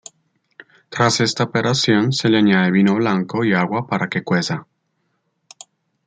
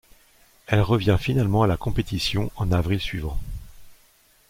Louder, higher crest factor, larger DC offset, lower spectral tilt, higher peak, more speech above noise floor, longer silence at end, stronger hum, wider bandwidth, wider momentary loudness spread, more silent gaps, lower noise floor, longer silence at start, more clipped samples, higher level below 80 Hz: first, -17 LUFS vs -23 LUFS; about the same, 18 dB vs 18 dB; neither; second, -5 dB/octave vs -6.5 dB/octave; first, 0 dBFS vs -6 dBFS; first, 52 dB vs 36 dB; first, 1.45 s vs 0.55 s; neither; second, 9.4 kHz vs 16 kHz; second, 7 LU vs 12 LU; neither; first, -69 dBFS vs -58 dBFS; first, 0.9 s vs 0.7 s; neither; second, -60 dBFS vs -36 dBFS